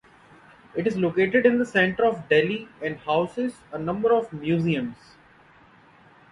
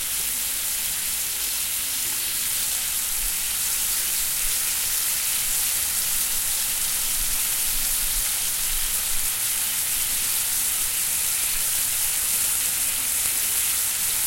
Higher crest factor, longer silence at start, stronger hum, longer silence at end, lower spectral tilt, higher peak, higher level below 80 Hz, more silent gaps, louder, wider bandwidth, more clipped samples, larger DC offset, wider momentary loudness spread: about the same, 20 dB vs 20 dB; first, 0.75 s vs 0 s; neither; first, 1.4 s vs 0 s; first, -7 dB/octave vs 1.5 dB/octave; about the same, -6 dBFS vs -4 dBFS; second, -60 dBFS vs -42 dBFS; neither; second, -24 LUFS vs -21 LUFS; second, 11 kHz vs 16.5 kHz; neither; neither; first, 11 LU vs 3 LU